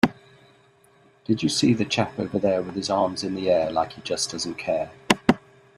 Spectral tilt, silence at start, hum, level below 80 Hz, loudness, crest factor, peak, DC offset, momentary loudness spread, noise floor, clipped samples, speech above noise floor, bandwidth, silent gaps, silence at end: -4.5 dB/octave; 0.05 s; none; -56 dBFS; -24 LUFS; 24 dB; 0 dBFS; under 0.1%; 7 LU; -57 dBFS; under 0.1%; 33 dB; 14 kHz; none; 0.4 s